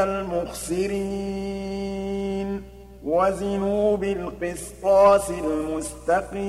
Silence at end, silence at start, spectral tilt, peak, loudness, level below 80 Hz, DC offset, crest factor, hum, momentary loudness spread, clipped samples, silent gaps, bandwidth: 0 s; 0 s; -5.5 dB/octave; -6 dBFS; -24 LUFS; -44 dBFS; under 0.1%; 18 dB; none; 13 LU; under 0.1%; none; 15 kHz